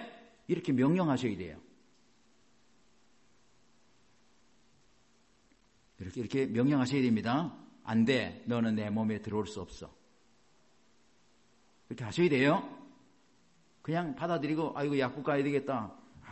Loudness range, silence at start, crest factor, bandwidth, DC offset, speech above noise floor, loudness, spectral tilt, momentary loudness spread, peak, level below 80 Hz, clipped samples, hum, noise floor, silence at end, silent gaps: 9 LU; 0 s; 20 dB; 8.4 kHz; under 0.1%; 38 dB; -32 LUFS; -7 dB/octave; 19 LU; -16 dBFS; -66 dBFS; under 0.1%; none; -69 dBFS; 0 s; none